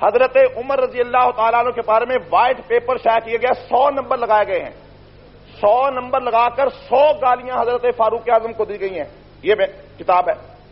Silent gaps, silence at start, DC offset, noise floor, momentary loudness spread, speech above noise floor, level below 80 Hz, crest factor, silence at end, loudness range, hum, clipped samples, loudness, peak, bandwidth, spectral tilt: none; 0 s; under 0.1%; -43 dBFS; 9 LU; 26 dB; -50 dBFS; 14 dB; 0.25 s; 2 LU; 50 Hz at -50 dBFS; under 0.1%; -17 LUFS; -4 dBFS; 5.8 kHz; -2 dB/octave